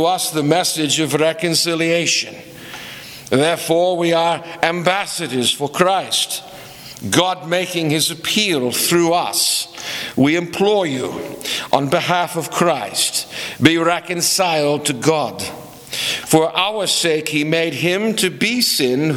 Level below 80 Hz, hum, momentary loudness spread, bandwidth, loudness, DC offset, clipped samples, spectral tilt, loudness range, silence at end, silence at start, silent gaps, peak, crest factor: -56 dBFS; none; 11 LU; 19.5 kHz; -17 LUFS; under 0.1%; under 0.1%; -3 dB/octave; 2 LU; 0 s; 0 s; none; 0 dBFS; 18 dB